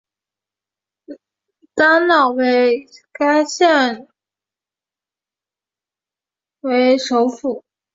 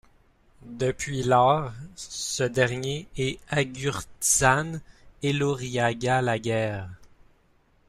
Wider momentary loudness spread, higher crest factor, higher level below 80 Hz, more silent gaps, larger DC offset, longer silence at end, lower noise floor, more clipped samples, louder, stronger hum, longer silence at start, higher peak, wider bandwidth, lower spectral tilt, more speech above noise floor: second, 13 LU vs 16 LU; about the same, 16 dB vs 20 dB; second, -66 dBFS vs -52 dBFS; neither; neither; second, 0.35 s vs 0.85 s; first, -90 dBFS vs -63 dBFS; neither; first, -15 LUFS vs -25 LUFS; neither; first, 1.1 s vs 0.65 s; first, -2 dBFS vs -6 dBFS; second, 7.8 kHz vs 15 kHz; second, -2.5 dB/octave vs -4 dB/octave; first, 75 dB vs 37 dB